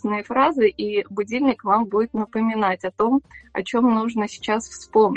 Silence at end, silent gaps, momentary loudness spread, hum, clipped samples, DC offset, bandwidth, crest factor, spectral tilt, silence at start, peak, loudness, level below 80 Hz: 0 s; none; 6 LU; none; under 0.1%; under 0.1%; 8.8 kHz; 16 dB; -5.5 dB/octave; 0.05 s; -6 dBFS; -22 LUFS; -58 dBFS